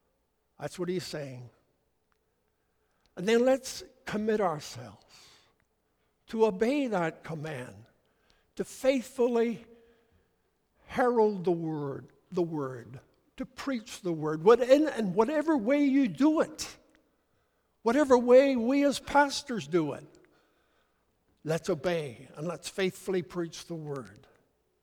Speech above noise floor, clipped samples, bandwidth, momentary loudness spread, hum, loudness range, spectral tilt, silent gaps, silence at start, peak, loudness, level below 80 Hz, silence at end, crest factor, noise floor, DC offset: 47 dB; under 0.1%; 17.5 kHz; 18 LU; none; 8 LU; -5.5 dB/octave; none; 0.6 s; -8 dBFS; -28 LUFS; -66 dBFS; 0.75 s; 22 dB; -75 dBFS; under 0.1%